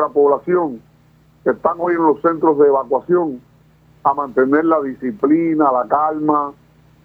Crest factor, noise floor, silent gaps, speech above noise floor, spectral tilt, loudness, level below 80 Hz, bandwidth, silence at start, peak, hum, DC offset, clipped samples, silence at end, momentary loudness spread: 16 dB; -51 dBFS; none; 36 dB; -10 dB/octave; -17 LUFS; -58 dBFS; 3.4 kHz; 0 s; -2 dBFS; none; under 0.1%; under 0.1%; 0.5 s; 9 LU